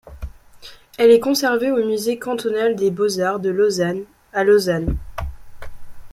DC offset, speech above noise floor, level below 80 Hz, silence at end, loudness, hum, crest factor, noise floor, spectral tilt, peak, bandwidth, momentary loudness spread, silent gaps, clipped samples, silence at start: under 0.1%; 25 dB; -38 dBFS; 0.05 s; -18 LUFS; none; 18 dB; -42 dBFS; -5 dB/octave; -2 dBFS; 15.5 kHz; 18 LU; none; under 0.1%; 0.05 s